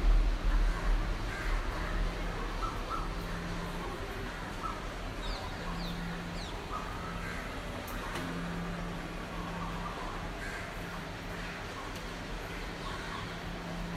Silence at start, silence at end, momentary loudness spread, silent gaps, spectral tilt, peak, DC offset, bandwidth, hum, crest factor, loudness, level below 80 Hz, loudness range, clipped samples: 0 s; 0 s; 6 LU; none; -5 dB/octave; -18 dBFS; under 0.1%; 15 kHz; none; 18 dB; -38 LUFS; -36 dBFS; 3 LU; under 0.1%